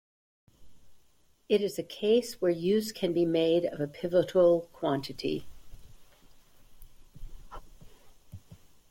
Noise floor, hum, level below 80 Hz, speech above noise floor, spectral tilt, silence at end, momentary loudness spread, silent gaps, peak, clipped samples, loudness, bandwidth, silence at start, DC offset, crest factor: -67 dBFS; none; -56 dBFS; 39 dB; -6 dB/octave; 0.35 s; 12 LU; none; -14 dBFS; under 0.1%; -28 LUFS; 16.5 kHz; 0.6 s; under 0.1%; 18 dB